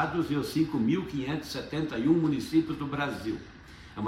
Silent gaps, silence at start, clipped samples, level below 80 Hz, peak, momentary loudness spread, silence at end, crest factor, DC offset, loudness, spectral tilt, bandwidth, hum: none; 0 s; under 0.1%; -54 dBFS; -12 dBFS; 12 LU; 0 s; 18 dB; under 0.1%; -29 LUFS; -6.5 dB/octave; 15 kHz; none